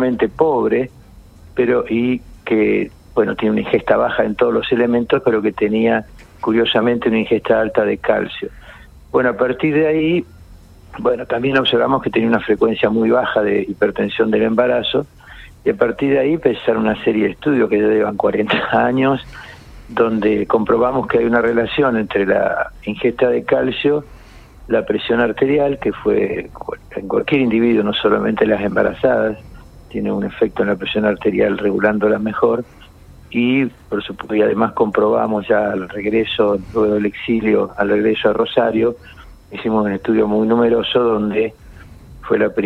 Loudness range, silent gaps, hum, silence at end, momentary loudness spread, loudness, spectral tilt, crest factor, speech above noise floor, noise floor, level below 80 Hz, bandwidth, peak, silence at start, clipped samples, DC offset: 2 LU; none; none; 0 s; 7 LU; -17 LUFS; -7.5 dB/octave; 16 dB; 25 dB; -41 dBFS; -44 dBFS; 5.8 kHz; -2 dBFS; 0 s; under 0.1%; under 0.1%